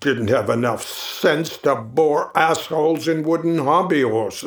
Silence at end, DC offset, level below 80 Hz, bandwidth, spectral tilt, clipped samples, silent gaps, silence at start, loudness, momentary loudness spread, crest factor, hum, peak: 0 s; under 0.1%; -62 dBFS; over 20 kHz; -5 dB/octave; under 0.1%; none; 0 s; -19 LUFS; 3 LU; 18 dB; none; 0 dBFS